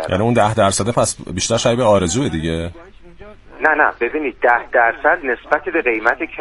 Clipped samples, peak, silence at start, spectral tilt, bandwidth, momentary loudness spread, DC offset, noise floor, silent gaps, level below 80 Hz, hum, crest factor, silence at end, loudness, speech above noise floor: under 0.1%; 0 dBFS; 0 s; -4 dB/octave; 11.5 kHz; 6 LU; under 0.1%; -39 dBFS; none; -42 dBFS; none; 18 dB; 0 s; -16 LUFS; 22 dB